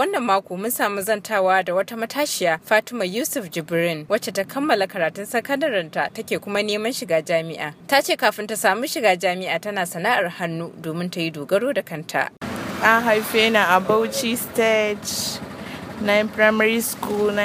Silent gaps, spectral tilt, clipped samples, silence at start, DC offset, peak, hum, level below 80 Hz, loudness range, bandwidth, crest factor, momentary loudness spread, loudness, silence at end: none; -3.5 dB/octave; under 0.1%; 0 s; under 0.1%; 0 dBFS; none; -62 dBFS; 4 LU; 15.5 kHz; 22 dB; 10 LU; -21 LUFS; 0 s